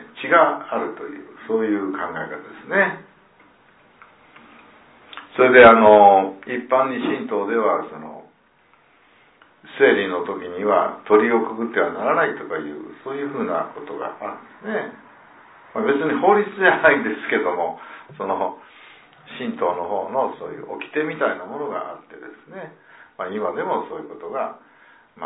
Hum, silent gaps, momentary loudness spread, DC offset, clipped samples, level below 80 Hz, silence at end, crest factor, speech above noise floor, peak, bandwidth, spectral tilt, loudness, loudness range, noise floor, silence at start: none; none; 20 LU; under 0.1%; under 0.1%; -62 dBFS; 0 s; 20 dB; 38 dB; 0 dBFS; 4 kHz; -9 dB/octave; -19 LUFS; 13 LU; -57 dBFS; 0 s